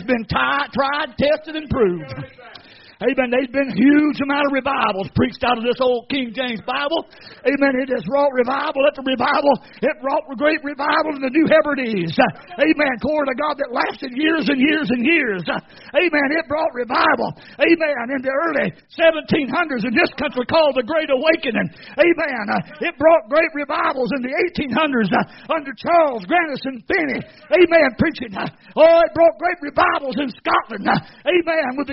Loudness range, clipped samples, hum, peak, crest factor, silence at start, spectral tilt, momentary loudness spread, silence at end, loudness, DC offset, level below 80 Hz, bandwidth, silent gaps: 3 LU; under 0.1%; none; 0 dBFS; 18 dB; 0 s; -3 dB/octave; 8 LU; 0 s; -18 LUFS; under 0.1%; -50 dBFS; 5.8 kHz; none